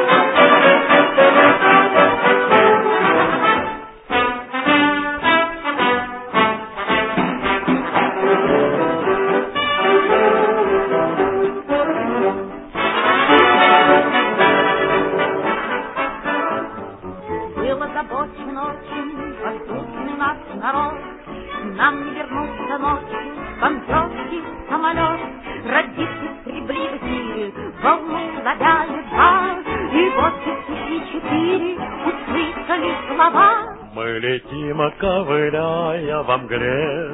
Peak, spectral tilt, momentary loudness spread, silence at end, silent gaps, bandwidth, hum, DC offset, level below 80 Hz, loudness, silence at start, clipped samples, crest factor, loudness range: 0 dBFS; -8.5 dB/octave; 15 LU; 0 s; none; 4 kHz; none; under 0.1%; -44 dBFS; -17 LUFS; 0 s; under 0.1%; 18 dB; 9 LU